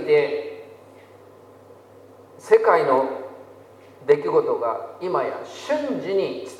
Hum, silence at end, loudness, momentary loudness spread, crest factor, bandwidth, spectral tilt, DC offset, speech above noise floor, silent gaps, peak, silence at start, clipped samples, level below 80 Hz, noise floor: none; 0 s; -22 LUFS; 17 LU; 22 dB; 11.5 kHz; -5.5 dB/octave; under 0.1%; 27 dB; none; -2 dBFS; 0 s; under 0.1%; -78 dBFS; -47 dBFS